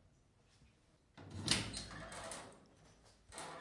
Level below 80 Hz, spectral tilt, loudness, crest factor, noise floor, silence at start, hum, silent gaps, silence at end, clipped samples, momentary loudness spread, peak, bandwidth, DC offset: -64 dBFS; -2.5 dB/octave; -42 LUFS; 30 dB; -71 dBFS; 0.05 s; none; none; 0 s; under 0.1%; 22 LU; -18 dBFS; 11.5 kHz; under 0.1%